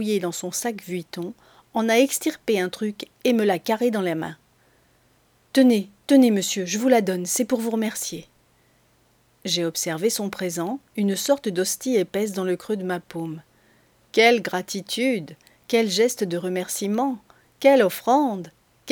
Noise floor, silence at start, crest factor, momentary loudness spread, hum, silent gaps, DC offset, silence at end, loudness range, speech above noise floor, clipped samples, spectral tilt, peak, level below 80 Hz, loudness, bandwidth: -61 dBFS; 0 s; 20 dB; 13 LU; none; none; under 0.1%; 0 s; 5 LU; 39 dB; under 0.1%; -4 dB/octave; -4 dBFS; -70 dBFS; -23 LUFS; over 20 kHz